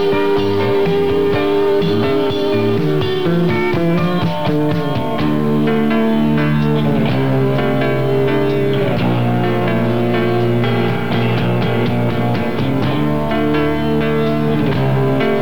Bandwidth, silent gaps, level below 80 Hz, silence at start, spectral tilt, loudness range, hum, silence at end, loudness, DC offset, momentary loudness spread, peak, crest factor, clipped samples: 19 kHz; none; -40 dBFS; 0 s; -8 dB/octave; 1 LU; none; 0 s; -16 LUFS; 6%; 2 LU; -6 dBFS; 10 dB; under 0.1%